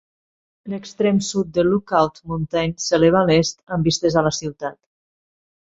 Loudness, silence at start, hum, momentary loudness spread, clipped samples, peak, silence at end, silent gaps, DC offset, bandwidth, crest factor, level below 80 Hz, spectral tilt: -19 LUFS; 0.65 s; none; 15 LU; under 0.1%; -2 dBFS; 0.95 s; 3.63-3.67 s; under 0.1%; 8 kHz; 18 dB; -48 dBFS; -5 dB/octave